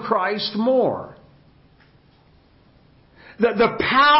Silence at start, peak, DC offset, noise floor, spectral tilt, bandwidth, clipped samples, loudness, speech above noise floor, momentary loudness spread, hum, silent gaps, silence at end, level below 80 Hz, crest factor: 0 s; -4 dBFS; under 0.1%; -54 dBFS; -8.5 dB/octave; 5.8 kHz; under 0.1%; -20 LUFS; 36 dB; 9 LU; none; none; 0 s; -54 dBFS; 16 dB